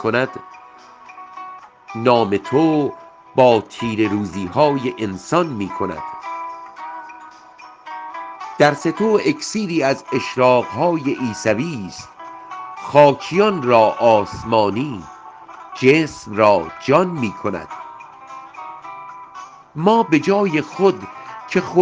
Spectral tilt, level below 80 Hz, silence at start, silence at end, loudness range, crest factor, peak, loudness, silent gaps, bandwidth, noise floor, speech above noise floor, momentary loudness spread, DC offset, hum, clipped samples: -6 dB/octave; -56 dBFS; 0 s; 0 s; 7 LU; 18 dB; 0 dBFS; -18 LUFS; none; 9.6 kHz; -42 dBFS; 25 dB; 21 LU; under 0.1%; none; under 0.1%